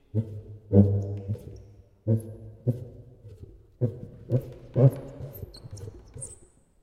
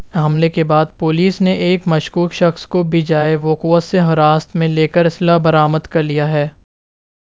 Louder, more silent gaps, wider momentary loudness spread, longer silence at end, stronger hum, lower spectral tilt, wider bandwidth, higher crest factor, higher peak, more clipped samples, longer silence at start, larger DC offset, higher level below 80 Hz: second, -27 LUFS vs -14 LUFS; neither; first, 24 LU vs 5 LU; second, 0.5 s vs 0.75 s; neither; first, -9 dB/octave vs -7.5 dB/octave; first, 14 kHz vs 7.6 kHz; first, 24 dB vs 14 dB; second, -4 dBFS vs 0 dBFS; neither; first, 0.15 s vs 0 s; second, under 0.1% vs 0.3%; second, -54 dBFS vs -48 dBFS